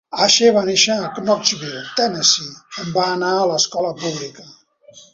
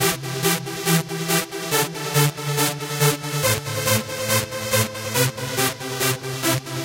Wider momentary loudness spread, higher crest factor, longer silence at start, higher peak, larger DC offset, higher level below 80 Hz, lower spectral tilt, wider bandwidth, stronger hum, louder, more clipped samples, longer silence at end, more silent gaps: first, 13 LU vs 2 LU; about the same, 18 dB vs 20 dB; about the same, 0.1 s vs 0 s; about the same, 0 dBFS vs -2 dBFS; neither; second, -62 dBFS vs -54 dBFS; second, -2 dB/octave vs -3.5 dB/octave; second, 8 kHz vs 17 kHz; neither; first, -17 LUFS vs -21 LUFS; neither; first, 0.15 s vs 0 s; neither